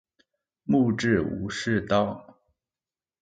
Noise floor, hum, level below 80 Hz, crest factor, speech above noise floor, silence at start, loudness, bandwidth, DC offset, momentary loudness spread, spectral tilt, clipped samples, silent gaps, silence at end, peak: under -90 dBFS; none; -52 dBFS; 20 dB; over 66 dB; 0.65 s; -25 LUFS; 9.2 kHz; under 0.1%; 10 LU; -6 dB/octave; under 0.1%; none; 1 s; -8 dBFS